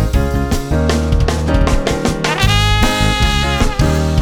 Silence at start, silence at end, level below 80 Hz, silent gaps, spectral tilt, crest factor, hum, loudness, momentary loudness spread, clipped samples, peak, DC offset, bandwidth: 0 s; 0 s; -18 dBFS; none; -5 dB/octave; 14 dB; none; -15 LUFS; 4 LU; under 0.1%; 0 dBFS; under 0.1%; 19 kHz